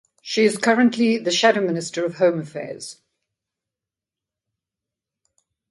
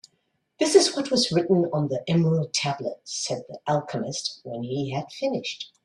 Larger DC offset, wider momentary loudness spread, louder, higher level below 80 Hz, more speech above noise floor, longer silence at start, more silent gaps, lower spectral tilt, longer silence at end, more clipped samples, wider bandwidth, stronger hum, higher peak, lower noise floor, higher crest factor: neither; first, 15 LU vs 12 LU; first, -19 LUFS vs -25 LUFS; second, -72 dBFS vs -66 dBFS; first, 68 dB vs 48 dB; second, 0.25 s vs 0.6 s; neither; about the same, -4 dB/octave vs -4.5 dB/octave; first, 2.8 s vs 0.2 s; neither; about the same, 11.5 kHz vs 12.5 kHz; neither; about the same, -2 dBFS vs -4 dBFS; first, -88 dBFS vs -73 dBFS; about the same, 20 dB vs 22 dB